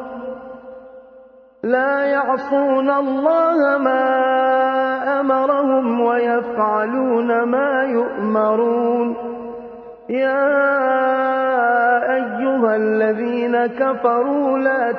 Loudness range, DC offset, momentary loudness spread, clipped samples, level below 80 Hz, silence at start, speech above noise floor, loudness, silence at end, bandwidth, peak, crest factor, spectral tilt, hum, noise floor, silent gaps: 3 LU; under 0.1%; 12 LU; under 0.1%; -64 dBFS; 0 s; 28 dB; -17 LUFS; 0 s; 5.6 kHz; -2 dBFS; 16 dB; -8 dB/octave; none; -45 dBFS; none